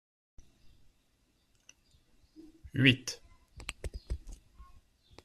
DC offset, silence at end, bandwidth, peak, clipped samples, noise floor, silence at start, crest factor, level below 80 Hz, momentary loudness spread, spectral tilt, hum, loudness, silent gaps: under 0.1%; 0.6 s; 13.5 kHz; -10 dBFS; under 0.1%; -72 dBFS; 2.4 s; 28 dB; -52 dBFS; 29 LU; -4.5 dB/octave; none; -32 LUFS; none